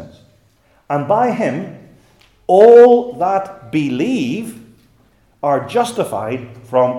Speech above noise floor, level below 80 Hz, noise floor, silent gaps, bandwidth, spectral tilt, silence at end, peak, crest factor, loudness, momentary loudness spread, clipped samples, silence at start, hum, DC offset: 42 dB; -58 dBFS; -55 dBFS; none; 12.5 kHz; -6.5 dB/octave; 0 s; 0 dBFS; 16 dB; -14 LUFS; 19 LU; 0.1%; 0 s; none; under 0.1%